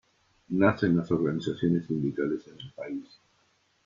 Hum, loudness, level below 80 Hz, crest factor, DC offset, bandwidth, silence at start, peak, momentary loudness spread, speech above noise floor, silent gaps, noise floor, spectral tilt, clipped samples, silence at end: none; -28 LUFS; -64 dBFS; 20 dB; under 0.1%; 7.4 kHz; 0.5 s; -10 dBFS; 14 LU; 41 dB; none; -69 dBFS; -8.5 dB/octave; under 0.1%; 0.85 s